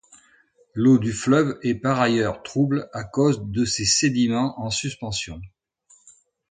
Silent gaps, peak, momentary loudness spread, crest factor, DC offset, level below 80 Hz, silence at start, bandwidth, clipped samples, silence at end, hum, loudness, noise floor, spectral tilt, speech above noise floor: none; -6 dBFS; 10 LU; 18 dB; under 0.1%; -50 dBFS; 0.75 s; 9.6 kHz; under 0.1%; 1.05 s; none; -22 LUFS; -59 dBFS; -4.5 dB/octave; 38 dB